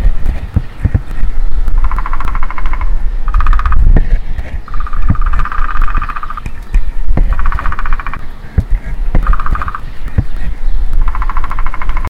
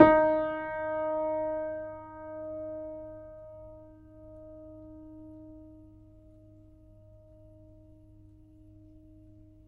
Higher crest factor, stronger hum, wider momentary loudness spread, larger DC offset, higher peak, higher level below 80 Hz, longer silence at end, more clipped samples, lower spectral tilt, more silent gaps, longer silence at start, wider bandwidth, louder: second, 8 dB vs 30 dB; neither; second, 8 LU vs 24 LU; neither; first, 0 dBFS vs -4 dBFS; first, -12 dBFS vs -56 dBFS; second, 0 s vs 0.7 s; first, 0.2% vs under 0.1%; second, -7.5 dB/octave vs -9 dB/octave; neither; about the same, 0 s vs 0 s; second, 3.9 kHz vs 4.9 kHz; first, -18 LUFS vs -31 LUFS